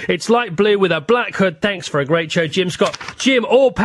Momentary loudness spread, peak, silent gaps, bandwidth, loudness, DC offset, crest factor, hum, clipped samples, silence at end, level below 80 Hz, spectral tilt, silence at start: 6 LU; -2 dBFS; none; 12 kHz; -16 LUFS; under 0.1%; 14 dB; none; under 0.1%; 0 s; -52 dBFS; -4.5 dB/octave; 0 s